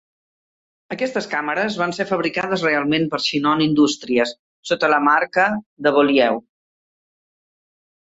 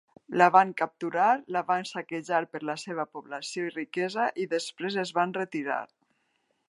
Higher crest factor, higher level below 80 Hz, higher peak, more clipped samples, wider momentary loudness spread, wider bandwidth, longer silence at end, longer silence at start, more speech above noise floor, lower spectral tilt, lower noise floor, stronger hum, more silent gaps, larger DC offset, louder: second, 18 dB vs 24 dB; first, -62 dBFS vs -84 dBFS; about the same, -4 dBFS vs -6 dBFS; neither; second, 8 LU vs 13 LU; second, 8 kHz vs 11.5 kHz; first, 1.7 s vs 0.85 s; first, 0.9 s vs 0.3 s; first, over 71 dB vs 46 dB; about the same, -4.5 dB/octave vs -4.5 dB/octave; first, under -90 dBFS vs -74 dBFS; neither; first, 4.39-4.63 s, 5.66-5.77 s vs none; neither; first, -19 LUFS vs -28 LUFS